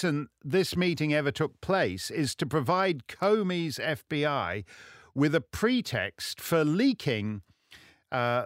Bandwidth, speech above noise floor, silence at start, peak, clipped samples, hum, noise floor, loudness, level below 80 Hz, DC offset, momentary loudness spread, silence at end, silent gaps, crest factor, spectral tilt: 16 kHz; 28 dB; 0 s; -12 dBFS; under 0.1%; none; -56 dBFS; -29 LUFS; -60 dBFS; under 0.1%; 8 LU; 0 s; none; 16 dB; -5.5 dB/octave